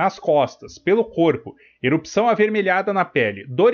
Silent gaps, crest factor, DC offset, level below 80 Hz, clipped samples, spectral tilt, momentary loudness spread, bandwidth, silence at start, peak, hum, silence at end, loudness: none; 14 dB; under 0.1%; -60 dBFS; under 0.1%; -6 dB/octave; 7 LU; 7 kHz; 0 s; -4 dBFS; none; 0 s; -20 LUFS